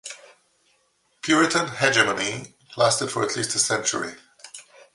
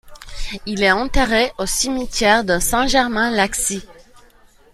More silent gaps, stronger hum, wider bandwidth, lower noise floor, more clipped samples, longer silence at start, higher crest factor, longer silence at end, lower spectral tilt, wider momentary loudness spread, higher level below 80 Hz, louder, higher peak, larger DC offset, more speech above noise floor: neither; neither; second, 11.5 kHz vs 16 kHz; first, -66 dBFS vs -49 dBFS; neither; about the same, 0.05 s vs 0.05 s; about the same, 22 dB vs 18 dB; second, 0.35 s vs 0.8 s; about the same, -2.5 dB/octave vs -2.5 dB/octave; first, 23 LU vs 14 LU; second, -66 dBFS vs -32 dBFS; second, -22 LUFS vs -17 LUFS; about the same, -2 dBFS vs -2 dBFS; neither; first, 44 dB vs 32 dB